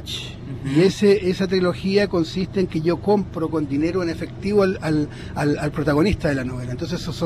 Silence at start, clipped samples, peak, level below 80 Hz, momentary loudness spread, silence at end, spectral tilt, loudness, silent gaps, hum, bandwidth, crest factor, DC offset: 0 s; under 0.1%; -6 dBFS; -40 dBFS; 10 LU; 0 s; -6.5 dB/octave; -21 LUFS; none; none; 14 kHz; 14 dB; under 0.1%